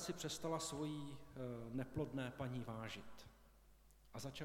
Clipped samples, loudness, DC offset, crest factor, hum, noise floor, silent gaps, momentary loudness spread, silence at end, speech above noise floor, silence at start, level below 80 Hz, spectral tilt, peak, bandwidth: under 0.1%; -47 LUFS; under 0.1%; 18 dB; none; -67 dBFS; none; 12 LU; 0 s; 21 dB; 0 s; -68 dBFS; -5 dB/octave; -30 dBFS; 17.5 kHz